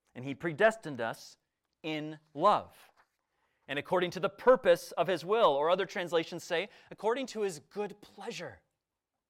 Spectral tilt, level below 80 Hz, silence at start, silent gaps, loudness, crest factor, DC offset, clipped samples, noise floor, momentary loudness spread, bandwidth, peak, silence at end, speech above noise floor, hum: -4.5 dB/octave; -72 dBFS; 0.15 s; none; -31 LUFS; 22 dB; under 0.1%; under 0.1%; -89 dBFS; 16 LU; 15.5 kHz; -12 dBFS; 0.75 s; 57 dB; none